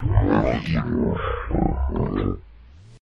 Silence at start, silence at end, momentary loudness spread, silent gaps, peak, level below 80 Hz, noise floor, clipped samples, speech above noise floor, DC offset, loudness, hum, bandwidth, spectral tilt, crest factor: 0 s; 0.05 s; 7 LU; none; -4 dBFS; -28 dBFS; -46 dBFS; under 0.1%; 23 dB; under 0.1%; -23 LUFS; none; 6.6 kHz; -9 dB/octave; 18 dB